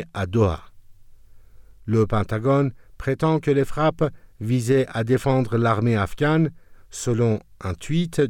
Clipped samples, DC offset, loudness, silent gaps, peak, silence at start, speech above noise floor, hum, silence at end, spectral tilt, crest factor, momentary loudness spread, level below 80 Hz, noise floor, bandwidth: under 0.1%; under 0.1%; -22 LUFS; none; -8 dBFS; 0 s; 24 dB; none; 0 s; -7 dB/octave; 14 dB; 10 LU; -44 dBFS; -45 dBFS; 15.5 kHz